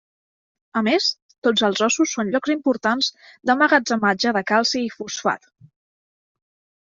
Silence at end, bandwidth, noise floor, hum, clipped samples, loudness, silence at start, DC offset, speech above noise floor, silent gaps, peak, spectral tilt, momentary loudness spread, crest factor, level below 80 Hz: 1.45 s; 7.8 kHz; under -90 dBFS; none; under 0.1%; -20 LUFS; 0.75 s; under 0.1%; over 70 dB; 1.22-1.29 s, 1.38-1.42 s; -2 dBFS; -3 dB/octave; 8 LU; 20 dB; -66 dBFS